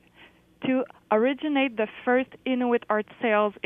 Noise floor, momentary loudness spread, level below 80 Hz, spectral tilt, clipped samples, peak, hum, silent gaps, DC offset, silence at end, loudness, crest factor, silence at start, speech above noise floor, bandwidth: -55 dBFS; 5 LU; -70 dBFS; -7.5 dB/octave; under 0.1%; -10 dBFS; none; none; under 0.1%; 0.15 s; -26 LUFS; 16 dB; 0.6 s; 30 dB; 3.8 kHz